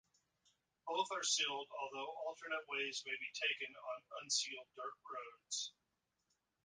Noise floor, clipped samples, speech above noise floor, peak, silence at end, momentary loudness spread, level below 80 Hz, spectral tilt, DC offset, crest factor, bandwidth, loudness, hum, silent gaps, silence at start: -85 dBFS; under 0.1%; 42 dB; -24 dBFS; 0.95 s; 14 LU; under -90 dBFS; 1 dB/octave; under 0.1%; 22 dB; 10 kHz; -42 LUFS; none; none; 0.85 s